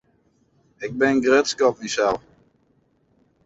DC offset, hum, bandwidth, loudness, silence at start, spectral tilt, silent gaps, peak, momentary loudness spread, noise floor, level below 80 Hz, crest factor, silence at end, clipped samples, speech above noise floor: under 0.1%; none; 8 kHz; -21 LUFS; 0.8 s; -3.5 dB/octave; none; -4 dBFS; 14 LU; -64 dBFS; -60 dBFS; 18 dB; 1.25 s; under 0.1%; 44 dB